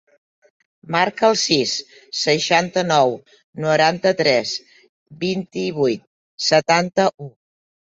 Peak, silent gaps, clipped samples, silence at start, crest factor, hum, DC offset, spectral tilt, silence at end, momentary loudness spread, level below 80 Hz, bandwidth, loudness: -2 dBFS; 3.44-3.53 s, 4.89-5.06 s, 6.07-6.38 s; under 0.1%; 0.85 s; 20 dB; none; under 0.1%; -3.5 dB/octave; 0.65 s; 12 LU; -62 dBFS; 8 kHz; -19 LUFS